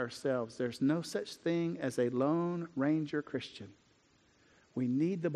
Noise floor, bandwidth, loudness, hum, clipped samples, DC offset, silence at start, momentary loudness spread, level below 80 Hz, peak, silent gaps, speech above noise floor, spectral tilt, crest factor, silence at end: -69 dBFS; 13 kHz; -35 LUFS; none; under 0.1%; under 0.1%; 0 s; 9 LU; -76 dBFS; -20 dBFS; none; 35 dB; -6.5 dB/octave; 16 dB; 0 s